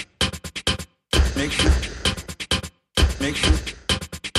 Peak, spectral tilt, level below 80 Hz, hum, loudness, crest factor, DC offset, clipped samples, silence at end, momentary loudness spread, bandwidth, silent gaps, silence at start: -6 dBFS; -3.5 dB/octave; -26 dBFS; none; -23 LUFS; 18 dB; under 0.1%; under 0.1%; 0 s; 5 LU; 14 kHz; none; 0 s